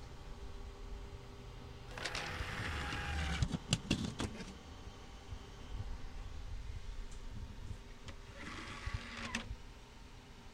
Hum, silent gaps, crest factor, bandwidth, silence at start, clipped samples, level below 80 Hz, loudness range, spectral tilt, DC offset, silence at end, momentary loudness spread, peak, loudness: none; none; 28 dB; 16 kHz; 0 s; under 0.1%; -48 dBFS; 10 LU; -4 dB/octave; under 0.1%; 0 s; 15 LU; -16 dBFS; -44 LUFS